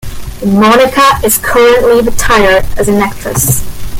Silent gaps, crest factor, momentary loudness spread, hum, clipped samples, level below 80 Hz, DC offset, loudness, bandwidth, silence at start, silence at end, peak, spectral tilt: none; 8 dB; 7 LU; none; under 0.1%; -22 dBFS; under 0.1%; -8 LUFS; 17 kHz; 0.05 s; 0 s; 0 dBFS; -4 dB/octave